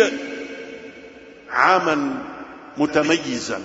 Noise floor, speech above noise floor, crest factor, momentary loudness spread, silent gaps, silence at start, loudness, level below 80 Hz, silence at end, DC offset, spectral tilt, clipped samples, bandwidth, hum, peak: -42 dBFS; 23 dB; 20 dB; 21 LU; none; 0 s; -20 LUFS; -58 dBFS; 0 s; under 0.1%; -4 dB/octave; under 0.1%; 8 kHz; none; -2 dBFS